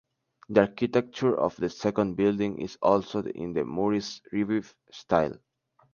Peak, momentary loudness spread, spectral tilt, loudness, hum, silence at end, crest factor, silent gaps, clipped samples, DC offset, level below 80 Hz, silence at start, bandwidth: -6 dBFS; 8 LU; -6.5 dB/octave; -27 LUFS; none; 0.6 s; 22 dB; none; under 0.1%; under 0.1%; -58 dBFS; 0.5 s; 7.2 kHz